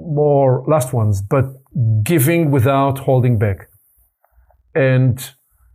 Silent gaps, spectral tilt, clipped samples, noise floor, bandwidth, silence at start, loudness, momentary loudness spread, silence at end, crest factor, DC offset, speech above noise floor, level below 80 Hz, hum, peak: none; -7 dB/octave; under 0.1%; -58 dBFS; 16 kHz; 0 s; -16 LUFS; 8 LU; 0.45 s; 12 dB; under 0.1%; 43 dB; -50 dBFS; none; -4 dBFS